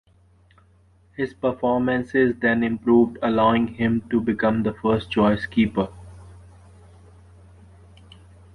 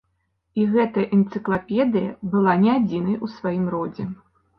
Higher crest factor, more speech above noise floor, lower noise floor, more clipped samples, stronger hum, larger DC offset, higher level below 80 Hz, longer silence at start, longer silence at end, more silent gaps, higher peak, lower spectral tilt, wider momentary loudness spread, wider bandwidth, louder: about the same, 18 dB vs 18 dB; second, 36 dB vs 51 dB; second, -56 dBFS vs -71 dBFS; neither; neither; neither; first, -48 dBFS vs -58 dBFS; first, 1.2 s vs 0.55 s; first, 2.15 s vs 0.45 s; neither; about the same, -4 dBFS vs -4 dBFS; second, -8 dB/octave vs -10 dB/octave; second, 7 LU vs 11 LU; about the same, 5.2 kHz vs 5.6 kHz; about the same, -21 LUFS vs -22 LUFS